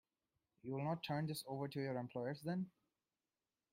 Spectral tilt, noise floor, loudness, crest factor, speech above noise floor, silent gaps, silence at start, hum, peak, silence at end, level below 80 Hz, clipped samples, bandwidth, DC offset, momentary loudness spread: -6.5 dB/octave; under -90 dBFS; -44 LUFS; 18 dB; over 47 dB; none; 0.65 s; none; -28 dBFS; 1.05 s; -82 dBFS; under 0.1%; 16 kHz; under 0.1%; 5 LU